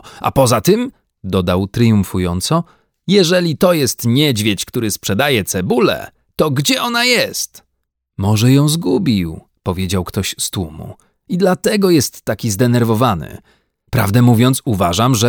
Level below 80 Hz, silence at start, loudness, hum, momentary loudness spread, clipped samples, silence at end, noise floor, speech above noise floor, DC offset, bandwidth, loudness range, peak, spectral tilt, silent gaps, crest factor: -42 dBFS; 0.05 s; -15 LUFS; none; 12 LU; under 0.1%; 0 s; -72 dBFS; 57 dB; under 0.1%; over 20 kHz; 3 LU; 0 dBFS; -5 dB/octave; none; 14 dB